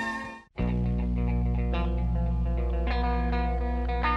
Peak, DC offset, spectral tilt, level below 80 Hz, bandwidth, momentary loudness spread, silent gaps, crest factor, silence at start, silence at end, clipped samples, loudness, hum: -14 dBFS; under 0.1%; -8 dB/octave; -28 dBFS; 6 kHz; 3 LU; none; 14 dB; 0 s; 0 s; under 0.1%; -29 LUFS; 60 Hz at -25 dBFS